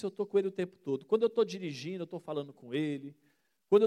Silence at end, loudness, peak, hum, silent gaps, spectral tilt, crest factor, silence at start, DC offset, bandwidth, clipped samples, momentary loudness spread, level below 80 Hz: 0 s; -34 LUFS; -14 dBFS; none; none; -6.5 dB/octave; 18 dB; 0 s; under 0.1%; 9.2 kHz; under 0.1%; 11 LU; -84 dBFS